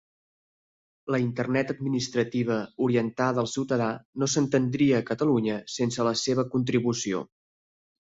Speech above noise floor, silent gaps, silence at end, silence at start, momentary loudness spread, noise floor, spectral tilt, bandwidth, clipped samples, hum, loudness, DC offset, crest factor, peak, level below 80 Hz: over 64 dB; 4.05-4.13 s; 0.95 s; 1.05 s; 6 LU; under -90 dBFS; -5.5 dB/octave; 8 kHz; under 0.1%; none; -26 LUFS; under 0.1%; 16 dB; -10 dBFS; -64 dBFS